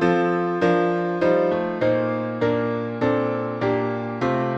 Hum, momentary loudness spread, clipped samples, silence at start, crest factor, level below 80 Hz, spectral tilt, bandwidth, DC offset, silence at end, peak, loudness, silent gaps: none; 5 LU; under 0.1%; 0 s; 16 dB; -58 dBFS; -8 dB/octave; 7.8 kHz; under 0.1%; 0 s; -6 dBFS; -22 LUFS; none